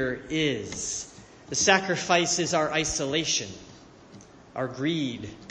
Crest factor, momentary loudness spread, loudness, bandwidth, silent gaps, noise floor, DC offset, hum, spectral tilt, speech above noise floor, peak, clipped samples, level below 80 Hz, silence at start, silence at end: 24 dB; 15 LU; -26 LUFS; 10.5 kHz; none; -50 dBFS; under 0.1%; none; -2.5 dB/octave; 23 dB; -4 dBFS; under 0.1%; -54 dBFS; 0 s; 0 s